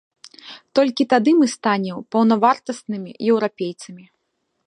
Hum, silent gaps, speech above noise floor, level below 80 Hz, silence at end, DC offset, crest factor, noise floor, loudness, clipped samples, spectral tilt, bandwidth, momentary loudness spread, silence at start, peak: none; none; 54 dB; -74 dBFS; 0.65 s; under 0.1%; 18 dB; -73 dBFS; -19 LUFS; under 0.1%; -5.5 dB/octave; 11 kHz; 17 LU; 0.45 s; -2 dBFS